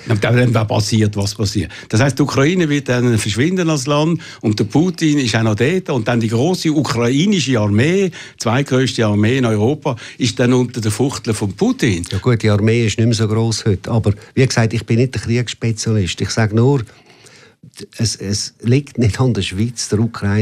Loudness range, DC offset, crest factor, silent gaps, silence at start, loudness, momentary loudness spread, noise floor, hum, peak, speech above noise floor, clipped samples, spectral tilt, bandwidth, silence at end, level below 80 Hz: 3 LU; under 0.1%; 14 dB; none; 0 s; -16 LUFS; 6 LU; -45 dBFS; none; -2 dBFS; 29 dB; under 0.1%; -5.5 dB/octave; 14.5 kHz; 0 s; -44 dBFS